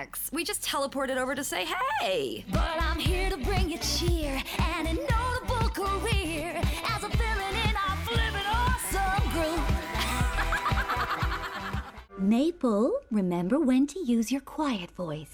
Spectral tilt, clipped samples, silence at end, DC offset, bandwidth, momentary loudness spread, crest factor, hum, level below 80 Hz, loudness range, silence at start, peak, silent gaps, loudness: -4.5 dB/octave; under 0.1%; 0 s; under 0.1%; over 20 kHz; 5 LU; 14 dB; none; -34 dBFS; 1 LU; 0 s; -14 dBFS; none; -29 LUFS